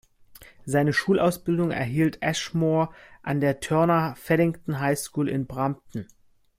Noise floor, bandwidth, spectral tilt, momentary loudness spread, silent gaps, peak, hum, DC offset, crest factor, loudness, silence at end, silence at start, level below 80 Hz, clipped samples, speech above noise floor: -51 dBFS; 16 kHz; -6 dB/octave; 8 LU; none; -8 dBFS; none; under 0.1%; 16 dB; -25 LUFS; 0.55 s; 0.35 s; -56 dBFS; under 0.1%; 26 dB